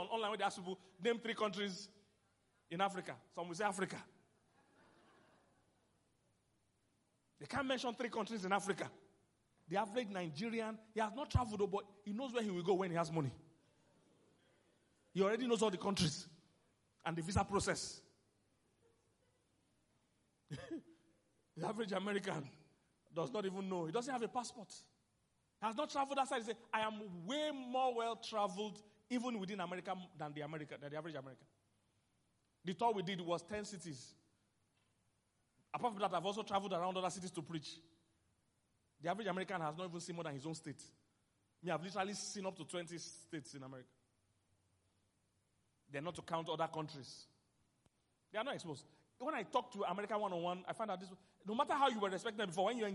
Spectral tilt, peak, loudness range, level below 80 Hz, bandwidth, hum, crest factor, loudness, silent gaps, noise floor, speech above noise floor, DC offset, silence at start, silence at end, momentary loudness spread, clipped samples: -4.5 dB/octave; -20 dBFS; 7 LU; -70 dBFS; 11.5 kHz; none; 24 dB; -42 LUFS; none; -81 dBFS; 39 dB; under 0.1%; 0 s; 0 s; 13 LU; under 0.1%